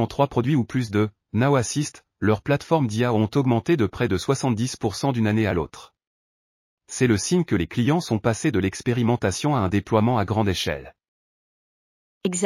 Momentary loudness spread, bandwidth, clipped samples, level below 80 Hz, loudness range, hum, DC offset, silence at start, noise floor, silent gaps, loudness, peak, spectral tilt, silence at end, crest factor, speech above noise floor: 5 LU; 14.5 kHz; under 0.1%; -50 dBFS; 2 LU; none; under 0.1%; 0 s; under -90 dBFS; 6.07-6.78 s, 11.08-12.21 s; -23 LUFS; -6 dBFS; -6 dB/octave; 0 s; 18 dB; over 68 dB